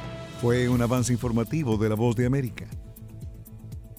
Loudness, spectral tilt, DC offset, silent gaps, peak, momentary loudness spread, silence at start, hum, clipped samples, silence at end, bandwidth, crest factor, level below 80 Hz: -25 LUFS; -6.5 dB/octave; under 0.1%; none; -12 dBFS; 19 LU; 0 s; none; under 0.1%; 0 s; 16.5 kHz; 14 dB; -44 dBFS